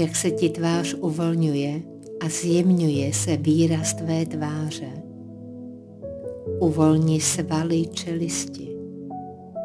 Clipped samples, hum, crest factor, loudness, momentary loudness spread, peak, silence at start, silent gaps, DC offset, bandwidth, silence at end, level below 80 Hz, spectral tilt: under 0.1%; none; 18 dB; -23 LUFS; 18 LU; -4 dBFS; 0 s; none; under 0.1%; 11 kHz; 0 s; -60 dBFS; -5.5 dB/octave